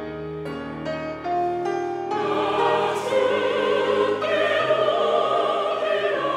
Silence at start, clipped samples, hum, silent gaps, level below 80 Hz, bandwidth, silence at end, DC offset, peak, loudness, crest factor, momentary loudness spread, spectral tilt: 0 s; under 0.1%; none; none; -60 dBFS; 12.5 kHz; 0 s; under 0.1%; -8 dBFS; -23 LUFS; 14 dB; 10 LU; -5 dB/octave